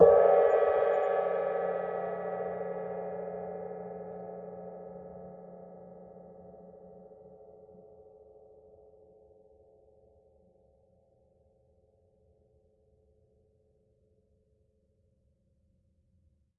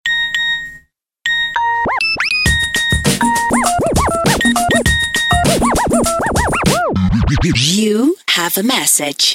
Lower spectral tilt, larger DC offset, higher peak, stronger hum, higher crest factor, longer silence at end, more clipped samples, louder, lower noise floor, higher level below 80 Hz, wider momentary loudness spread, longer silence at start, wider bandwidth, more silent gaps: first, -5.5 dB/octave vs -3.5 dB/octave; neither; second, -8 dBFS vs 0 dBFS; neither; first, 26 dB vs 14 dB; first, 9.25 s vs 0 s; neither; second, -30 LUFS vs -13 LUFS; first, -71 dBFS vs -46 dBFS; second, -70 dBFS vs -28 dBFS; first, 28 LU vs 3 LU; about the same, 0 s vs 0.05 s; second, 3.9 kHz vs 17 kHz; neither